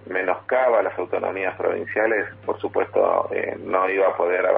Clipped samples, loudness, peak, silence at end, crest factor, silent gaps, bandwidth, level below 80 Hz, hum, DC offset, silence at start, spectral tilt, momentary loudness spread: under 0.1%; -22 LUFS; -6 dBFS; 0 s; 16 dB; none; 4 kHz; -66 dBFS; none; under 0.1%; 0.05 s; -9 dB/octave; 6 LU